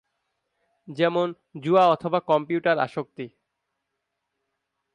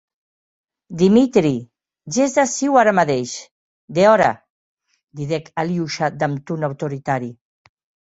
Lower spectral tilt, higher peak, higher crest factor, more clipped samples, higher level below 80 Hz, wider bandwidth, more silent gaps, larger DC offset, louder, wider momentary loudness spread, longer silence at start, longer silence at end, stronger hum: first, -7 dB/octave vs -5.5 dB/octave; second, -6 dBFS vs -2 dBFS; about the same, 20 dB vs 18 dB; neither; second, -74 dBFS vs -58 dBFS; first, 10.5 kHz vs 8.2 kHz; second, none vs 3.51-3.88 s, 4.50-4.77 s, 5.03-5.07 s; neither; second, -23 LUFS vs -18 LUFS; first, 19 LU vs 14 LU; about the same, 0.9 s vs 0.9 s; first, 1.65 s vs 0.8 s; neither